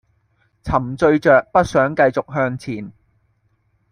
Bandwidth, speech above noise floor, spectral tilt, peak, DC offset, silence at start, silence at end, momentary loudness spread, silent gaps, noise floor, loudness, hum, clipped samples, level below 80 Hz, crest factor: 10.5 kHz; 47 dB; -7 dB/octave; -2 dBFS; under 0.1%; 0.65 s; 1 s; 16 LU; none; -63 dBFS; -17 LUFS; none; under 0.1%; -44 dBFS; 18 dB